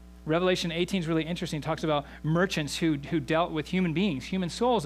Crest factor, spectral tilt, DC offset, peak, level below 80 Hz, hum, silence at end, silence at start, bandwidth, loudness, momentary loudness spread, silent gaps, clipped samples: 16 dB; -5.5 dB/octave; under 0.1%; -12 dBFS; -50 dBFS; none; 0 s; 0 s; 15 kHz; -28 LUFS; 5 LU; none; under 0.1%